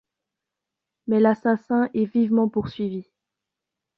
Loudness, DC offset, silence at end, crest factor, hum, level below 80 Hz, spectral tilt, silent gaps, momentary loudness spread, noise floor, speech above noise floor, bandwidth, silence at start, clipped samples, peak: -22 LUFS; under 0.1%; 0.95 s; 18 dB; none; -60 dBFS; -9.5 dB/octave; none; 10 LU; -85 dBFS; 64 dB; 5.2 kHz; 1.05 s; under 0.1%; -6 dBFS